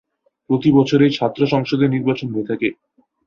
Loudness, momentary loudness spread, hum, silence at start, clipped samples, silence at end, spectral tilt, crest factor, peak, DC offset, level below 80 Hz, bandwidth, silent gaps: -18 LUFS; 9 LU; none; 0.5 s; under 0.1%; 0.55 s; -7.5 dB/octave; 16 dB; -2 dBFS; under 0.1%; -56 dBFS; 7 kHz; none